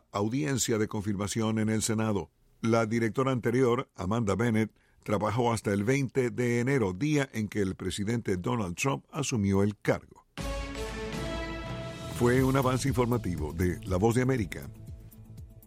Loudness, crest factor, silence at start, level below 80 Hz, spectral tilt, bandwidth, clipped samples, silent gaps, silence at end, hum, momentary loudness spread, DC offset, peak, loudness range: -29 LUFS; 18 dB; 0.15 s; -48 dBFS; -6 dB/octave; 16.5 kHz; under 0.1%; none; 0.1 s; none; 11 LU; under 0.1%; -12 dBFS; 3 LU